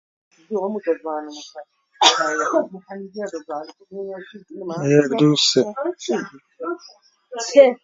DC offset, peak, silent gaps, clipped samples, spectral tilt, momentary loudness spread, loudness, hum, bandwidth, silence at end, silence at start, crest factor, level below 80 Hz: under 0.1%; 0 dBFS; none; under 0.1%; -4 dB/octave; 20 LU; -20 LUFS; none; 7.8 kHz; 0.1 s; 0.5 s; 22 dB; -70 dBFS